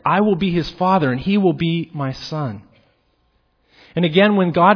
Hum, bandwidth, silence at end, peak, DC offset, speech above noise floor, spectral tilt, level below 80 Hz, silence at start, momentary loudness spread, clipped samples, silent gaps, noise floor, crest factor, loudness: none; 5.4 kHz; 0 s; 0 dBFS; under 0.1%; 46 dB; -8 dB/octave; -48 dBFS; 0.05 s; 12 LU; under 0.1%; none; -63 dBFS; 18 dB; -18 LUFS